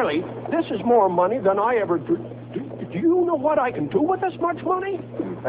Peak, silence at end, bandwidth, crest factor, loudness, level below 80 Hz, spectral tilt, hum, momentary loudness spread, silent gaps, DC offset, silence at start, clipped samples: -8 dBFS; 0 s; 4 kHz; 14 dB; -22 LUFS; -58 dBFS; -11 dB/octave; none; 12 LU; none; under 0.1%; 0 s; under 0.1%